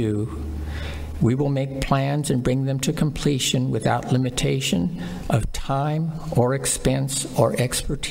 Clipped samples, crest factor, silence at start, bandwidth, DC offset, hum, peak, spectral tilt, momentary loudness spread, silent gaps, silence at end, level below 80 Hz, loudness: under 0.1%; 18 dB; 0 s; 16 kHz; under 0.1%; none; -6 dBFS; -5 dB/octave; 7 LU; none; 0 s; -36 dBFS; -23 LUFS